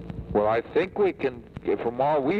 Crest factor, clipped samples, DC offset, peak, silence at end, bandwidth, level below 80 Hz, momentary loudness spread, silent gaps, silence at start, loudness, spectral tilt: 14 dB; under 0.1%; under 0.1%; -12 dBFS; 0 s; 6 kHz; -48 dBFS; 7 LU; none; 0 s; -26 LUFS; -8.5 dB/octave